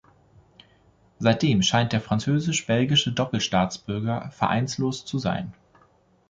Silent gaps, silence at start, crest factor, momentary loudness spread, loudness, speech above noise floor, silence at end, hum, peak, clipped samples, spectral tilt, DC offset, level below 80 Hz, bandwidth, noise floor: none; 1.2 s; 18 dB; 8 LU; -24 LUFS; 37 dB; 0.75 s; none; -6 dBFS; under 0.1%; -5 dB/octave; under 0.1%; -52 dBFS; 9.4 kHz; -60 dBFS